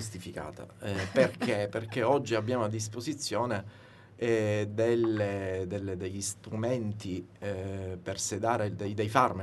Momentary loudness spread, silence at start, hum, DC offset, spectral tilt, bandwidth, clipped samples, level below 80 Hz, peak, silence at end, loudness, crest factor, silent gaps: 11 LU; 0 s; none; under 0.1%; -5 dB/octave; 12 kHz; under 0.1%; -64 dBFS; -8 dBFS; 0 s; -32 LUFS; 22 dB; none